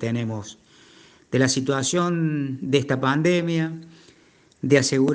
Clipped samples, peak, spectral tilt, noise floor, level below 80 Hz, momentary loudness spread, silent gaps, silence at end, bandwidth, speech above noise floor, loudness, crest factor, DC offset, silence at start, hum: under 0.1%; -4 dBFS; -5 dB/octave; -56 dBFS; -64 dBFS; 12 LU; none; 0 s; 10 kHz; 35 dB; -22 LUFS; 20 dB; under 0.1%; 0 s; none